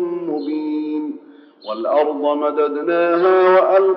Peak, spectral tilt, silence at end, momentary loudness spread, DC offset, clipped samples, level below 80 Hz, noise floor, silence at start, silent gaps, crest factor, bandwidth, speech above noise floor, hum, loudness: -2 dBFS; -3.5 dB/octave; 0 s; 15 LU; under 0.1%; under 0.1%; under -90 dBFS; -43 dBFS; 0 s; none; 14 dB; 5.6 kHz; 28 dB; none; -17 LUFS